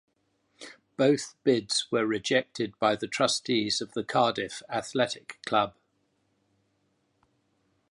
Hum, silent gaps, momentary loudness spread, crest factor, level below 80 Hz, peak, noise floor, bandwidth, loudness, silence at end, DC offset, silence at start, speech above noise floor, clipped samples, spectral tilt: none; none; 9 LU; 20 dB; -70 dBFS; -10 dBFS; -73 dBFS; 11.5 kHz; -28 LUFS; 2.2 s; under 0.1%; 0.6 s; 46 dB; under 0.1%; -3.5 dB/octave